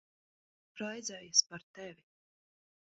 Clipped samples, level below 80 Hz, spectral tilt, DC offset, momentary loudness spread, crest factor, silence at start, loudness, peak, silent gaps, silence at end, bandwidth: under 0.1%; -84 dBFS; -0.5 dB/octave; under 0.1%; 21 LU; 28 dB; 0.75 s; -32 LUFS; -12 dBFS; 1.63-1.74 s; 1.05 s; 7.6 kHz